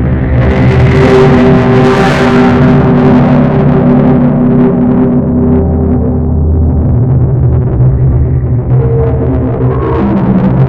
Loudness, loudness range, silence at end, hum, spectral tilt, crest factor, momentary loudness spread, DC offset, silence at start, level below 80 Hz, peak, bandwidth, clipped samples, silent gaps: -8 LUFS; 3 LU; 0 s; none; -9 dB/octave; 6 dB; 5 LU; under 0.1%; 0 s; -18 dBFS; 0 dBFS; 7.8 kHz; under 0.1%; none